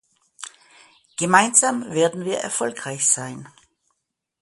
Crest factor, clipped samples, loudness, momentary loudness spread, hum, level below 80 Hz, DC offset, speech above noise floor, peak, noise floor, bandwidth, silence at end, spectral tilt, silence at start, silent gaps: 24 dB; under 0.1%; -19 LUFS; 23 LU; none; -68 dBFS; under 0.1%; 57 dB; 0 dBFS; -78 dBFS; 12 kHz; 0.95 s; -2.5 dB/octave; 0.4 s; none